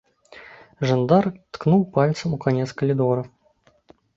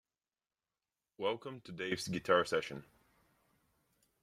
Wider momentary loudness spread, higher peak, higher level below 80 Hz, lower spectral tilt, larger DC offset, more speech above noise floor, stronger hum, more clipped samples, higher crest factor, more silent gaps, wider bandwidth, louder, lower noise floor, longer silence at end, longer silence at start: second, 9 LU vs 16 LU; first, -4 dBFS vs -14 dBFS; first, -58 dBFS vs -74 dBFS; first, -8 dB/octave vs -4.5 dB/octave; neither; second, 40 dB vs over 54 dB; neither; neither; second, 20 dB vs 26 dB; neither; second, 7.8 kHz vs 15.5 kHz; first, -21 LUFS vs -36 LUFS; second, -61 dBFS vs under -90 dBFS; second, 0.9 s vs 1.4 s; second, 0.35 s vs 1.2 s